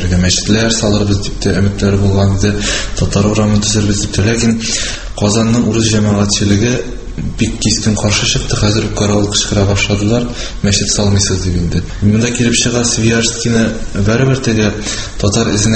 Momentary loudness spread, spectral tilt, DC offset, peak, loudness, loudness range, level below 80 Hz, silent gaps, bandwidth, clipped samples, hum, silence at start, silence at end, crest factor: 5 LU; -4.5 dB/octave; under 0.1%; 0 dBFS; -13 LUFS; 1 LU; -26 dBFS; none; 8.8 kHz; under 0.1%; none; 0 s; 0 s; 12 dB